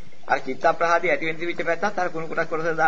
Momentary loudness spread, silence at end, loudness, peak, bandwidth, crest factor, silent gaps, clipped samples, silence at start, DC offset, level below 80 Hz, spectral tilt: 7 LU; 0 s; -24 LUFS; -6 dBFS; 7.6 kHz; 18 dB; none; under 0.1%; 0.3 s; 4%; -60 dBFS; -5 dB/octave